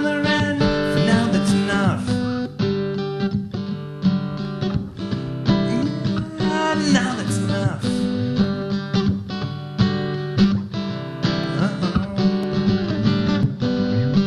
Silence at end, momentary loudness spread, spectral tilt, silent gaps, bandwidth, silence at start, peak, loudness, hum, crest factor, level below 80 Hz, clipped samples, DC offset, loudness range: 0 s; 8 LU; -6.5 dB/octave; none; 11.5 kHz; 0 s; -4 dBFS; -21 LUFS; none; 16 dB; -42 dBFS; under 0.1%; under 0.1%; 3 LU